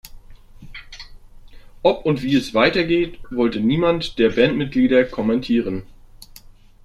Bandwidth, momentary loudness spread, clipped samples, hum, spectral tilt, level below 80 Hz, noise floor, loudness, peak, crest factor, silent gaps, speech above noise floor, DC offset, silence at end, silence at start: 13.5 kHz; 21 LU; under 0.1%; none; -6.5 dB/octave; -42 dBFS; -45 dBFS; -19 LUFS; -2 dBFS; 18 dB; none; 26 dB; under 0.1%; 0.6 s; 0.05 s